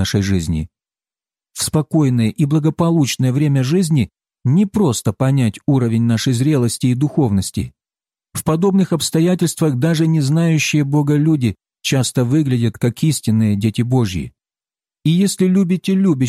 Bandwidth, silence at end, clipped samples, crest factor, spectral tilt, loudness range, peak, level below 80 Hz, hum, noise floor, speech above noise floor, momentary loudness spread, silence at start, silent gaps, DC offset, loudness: 15 kHz; 0 s; under 0.1%; 12 dB; -6 dB/octave; 2 LU; -4 dBFS; -44 dBFS; none; under -90 dBFS; over 75 dB; 7 LU; 0 s; none; under 0.1%; -16 LUFS